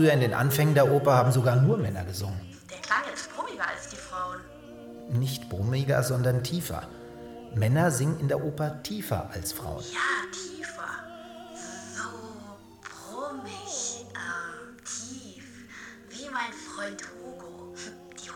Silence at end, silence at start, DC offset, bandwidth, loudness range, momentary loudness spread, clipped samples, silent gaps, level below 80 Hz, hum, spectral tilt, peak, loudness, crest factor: 0 s; 0 s; under 0.1%; 19 kHz; 12 LU; 21 LU; under 0.1%; none; -56 dBFS; none; -5.5 dB/octave; -8 dBFS; -28 LUFS; 22 dB